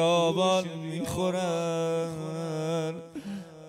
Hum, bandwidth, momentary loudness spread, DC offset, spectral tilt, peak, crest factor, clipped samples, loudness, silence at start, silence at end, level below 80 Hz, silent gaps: none; 16 kHz; 14 LU; under 0.1%; -5 dB/octave; -14 dBFS; 16 dB; under 0.1%; -29 LUFS; 0 s; 0 s; -62 dBFS; none